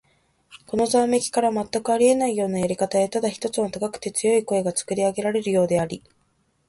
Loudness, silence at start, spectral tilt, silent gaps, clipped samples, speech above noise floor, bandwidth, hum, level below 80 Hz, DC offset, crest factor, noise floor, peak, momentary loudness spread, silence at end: -22 LUFS; 0.5 s; -4.5 dB/octave; none; under 0.1%; 45 dB; 11.5 kHz; none; -58 dBFS; under 0.1%; 16 dB; -67 dBFS; -6 dBFS; 7 LU; 0.7 s